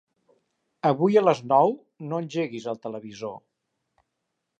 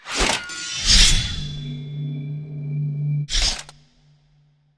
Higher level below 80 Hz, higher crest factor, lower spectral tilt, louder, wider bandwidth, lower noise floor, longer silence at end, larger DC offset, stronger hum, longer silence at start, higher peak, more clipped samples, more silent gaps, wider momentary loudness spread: second, -78 dBFS vs -28 dBFS; about the same, 20 dB vs 20 dB; first, -7 dB/octave vs -2.5 dB/octave; second, -24 LUFS vs -21 LUFS; second, 8.2 kHz vs 11 kHz; first, -80 dBFS vs -59 dBFS; first, 1.2 s vs 1.05 s; neither; neither; first, 0.85 s vs 0.05 s; second, -6 dBFS vs -2 dBFS; neither; neither; about the same, 16 LU vs 18 LU